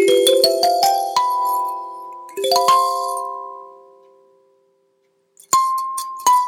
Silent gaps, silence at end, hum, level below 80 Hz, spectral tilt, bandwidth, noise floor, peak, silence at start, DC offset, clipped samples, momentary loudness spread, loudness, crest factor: none; 0 s; none; -76 dBFS; -1 dB/octave; 19.5 kHz; -64 dBFS; -2 dBFS; 0 s; under 0.1%; under 0.1%; 18 LU; -17 LUFS; 18 dB